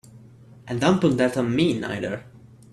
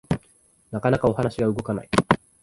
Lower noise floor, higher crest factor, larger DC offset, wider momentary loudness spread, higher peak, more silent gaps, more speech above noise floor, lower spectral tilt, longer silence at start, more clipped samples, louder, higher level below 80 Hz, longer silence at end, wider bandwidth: second, -48 dBFS vs -59 dBFS; about the same, 18 dB vs 22 dB; neither; first, 12 LU vs 8 LU; second, -6 dBFS vs -2 dBFS; neither; second, 26 dB vs 37 dB; about the same, -6.5 dB/octave vs -6.5 dB/octave; about the same, 0.15 s vs 0.1 s; neither; about the same, -23 LUFS vs -24 LUFS; second, -56 dBFS vs -46 dBFS; first, 0.45 s vs 0.25 s; first, 13 kHz vs 11.5 kHz